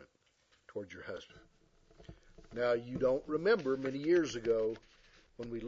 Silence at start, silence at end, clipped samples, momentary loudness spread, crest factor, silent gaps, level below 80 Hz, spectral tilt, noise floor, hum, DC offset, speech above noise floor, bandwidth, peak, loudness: 0 s; 0 s; under 0.1%; 17 LU; 18 dB; none; -62 dBFS; -6 dB/octave; -72 dBFS; none; under 0.1%; 38 dB; 7.4 kHz; -18 dBFS; -34 LUFS